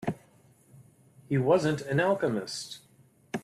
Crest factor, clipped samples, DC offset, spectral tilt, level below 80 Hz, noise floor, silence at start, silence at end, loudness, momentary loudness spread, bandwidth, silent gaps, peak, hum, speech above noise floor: 18 dB; under 0.1%; under 0.1%; -6 dB/octave; -66 dBFS; -60 dBFS; 0 s; 0.05 s; -28 LUFS; 17 LU; 14 kHz; none; -12 dBFS; none; 33 dB